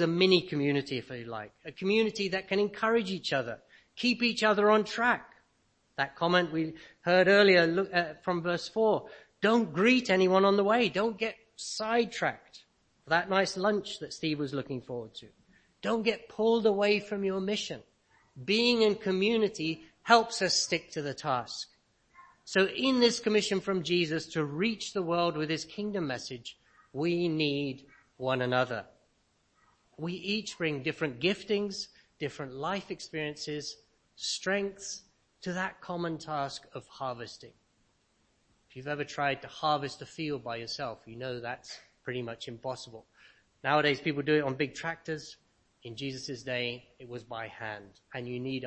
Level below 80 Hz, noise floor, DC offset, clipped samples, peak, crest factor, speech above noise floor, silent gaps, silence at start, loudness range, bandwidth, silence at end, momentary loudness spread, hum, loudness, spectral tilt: -68 dBFS; -72 dBFS; under 0.1%; under 0.1%; -6 dBFS; 24 dB; 42 dB; none; 0 s; 10 LU; 8.8 kHz; 0 s; 16 LU; none; -30 LUFS; -4.5 dB/octave